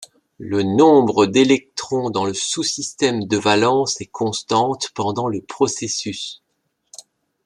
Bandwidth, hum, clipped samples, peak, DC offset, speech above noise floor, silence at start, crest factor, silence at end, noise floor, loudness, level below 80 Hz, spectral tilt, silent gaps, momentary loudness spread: 11 kHz; none; under 0.1%; -2 dBFS; under 0.1%; 53 dB; 0 s; 18 dB; 1.1 s; -71 dBFS; -18 LUFS; -62 dBFS; -4 dB/octave; none; 10 LU